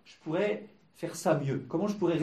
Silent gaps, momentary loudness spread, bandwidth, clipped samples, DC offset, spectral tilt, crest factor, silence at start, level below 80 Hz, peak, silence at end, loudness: none; 10 LU; 14 kHz; under 0.1%; under 0.1%; -6.5 dB/octave; 18 dB; 0.05 s; -72 dBFS; -14 dBFS; 0 s; -32 LUFS